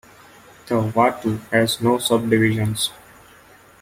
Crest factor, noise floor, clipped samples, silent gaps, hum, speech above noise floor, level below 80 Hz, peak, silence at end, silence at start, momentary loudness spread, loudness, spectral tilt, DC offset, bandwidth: 18 dB; -49 dBFS; under 0.1%; none; none; 30 dB; -54 dBFS; -2 dBFS; 0.9 s; 0.65 s; 7 LU; -20 LUFS; -5 dB/octave; under 0.1%; 16.5 kHz